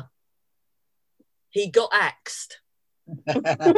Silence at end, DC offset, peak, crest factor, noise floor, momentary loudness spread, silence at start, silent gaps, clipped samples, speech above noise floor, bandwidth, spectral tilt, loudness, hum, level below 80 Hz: 0 s; under 0.1%; -4 dBFS; 20 dB; -81 dBFS; 16 LU; 0 s; none; under 0.1%; 59 dB; 12 kHz; -4.5 dB/octave; -24 LUFS; none; -72 dBFS